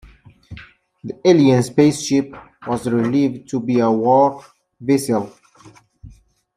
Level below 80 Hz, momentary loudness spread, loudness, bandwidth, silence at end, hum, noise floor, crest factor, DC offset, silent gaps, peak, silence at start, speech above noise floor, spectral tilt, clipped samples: -54 dBFS; 21 LU; -17 LUFS; 14.5 kHz; 0.5 s; none; -48 dBFS; 16 dB; under 0.1%; none; -2 dBFS; 0.05 s; 31 dB; -6.5 dB/octave; under 0.1%